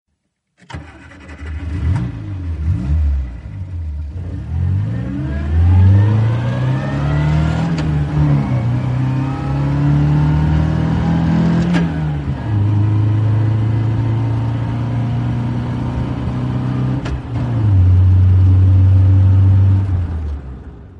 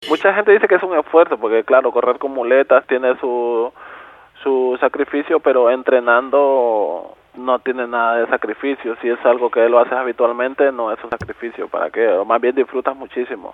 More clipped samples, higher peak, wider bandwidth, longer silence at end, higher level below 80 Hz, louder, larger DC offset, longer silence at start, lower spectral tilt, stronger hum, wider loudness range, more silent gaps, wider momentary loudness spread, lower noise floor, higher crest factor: neither; about the same, -2 dBFS vs 0 dBFS; second, 6 kHz vs 7 kHz; about the same, 0 s vs 0.05 s; first, -26 dBFS vs -60 dBFS; about the same, -16 LUFS vs -16 LUFS; neither; first, 0.7 s vs 0 s; first, -9 dB/octave vs -6 dB/octave; neither; first, 9 LU vs 3 LU; neither; first, 15 LU vs 11 LU; first, -70 dBFS vs -40 dBFS; about the same, 12 dB vs 16 dB